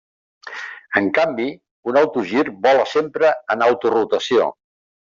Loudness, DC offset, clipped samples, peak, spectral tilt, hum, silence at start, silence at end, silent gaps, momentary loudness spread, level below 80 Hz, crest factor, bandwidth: -18 LUFS; under 0.1%; under 0.1%; -2 dBFS; -5 dB/octave; none; 0.45 s; 0.65 s; 1.71-1.83 s; 13 LU; -66 dBFS; 16 dB; 7.6 kHz